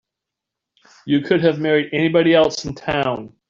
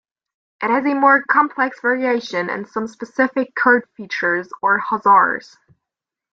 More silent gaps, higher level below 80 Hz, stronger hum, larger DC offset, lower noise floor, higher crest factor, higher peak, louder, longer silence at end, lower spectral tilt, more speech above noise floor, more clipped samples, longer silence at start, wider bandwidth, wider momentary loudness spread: neither; first, -52 dBFS vs -68 dBFS; neither; neither; about the same, -83 dBFS vs -85 dBFS; about the same, 16 dB vs 18 dB; about the same, -4 dBFS vs -2 dBFS; about the same, -18 LUFS vs -18 LUFS; second, 0.2 s vs 0.9 s; about the same, -5.5 dB/octave vs -5.5 dB/octave; about the same, 66 dB vs 67 dB; neither; first, 1.05 s vs 0.6 s; about the same, 7.4 kHz vs 7.6 kHz; second, 9 LU vs 12 LU